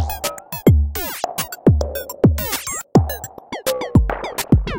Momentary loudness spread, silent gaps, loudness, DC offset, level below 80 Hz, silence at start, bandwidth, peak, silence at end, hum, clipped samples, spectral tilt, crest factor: 9 LU; none; -19 LUFS; under 0.1%; -26 dBFS; 0 s; 17 kHz; 0 dBFS; 0 s; none; under 0.1%; -6 dB/octave; 18 dB